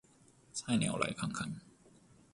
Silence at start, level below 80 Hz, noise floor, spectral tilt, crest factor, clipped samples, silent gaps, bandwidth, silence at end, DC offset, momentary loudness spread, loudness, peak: 0.55 s; -66 dBFS; -65 dBFS; -4.5 dB/octave; 22 dB; under 0.1%; none; 11.5 kHz; 0.65 s; under 0.1%; 11 LU; -36 LUFS; -18 dBFS